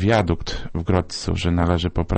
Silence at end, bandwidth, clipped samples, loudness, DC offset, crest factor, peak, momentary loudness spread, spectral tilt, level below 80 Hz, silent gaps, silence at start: 0 s; 8.8 kHz; under 0.1%; -22 LUFS; under 0.1%; 16 dB; -4 dBFS; 7 LU; -6.5 dB/octave; -32 dBFS; none; 0 s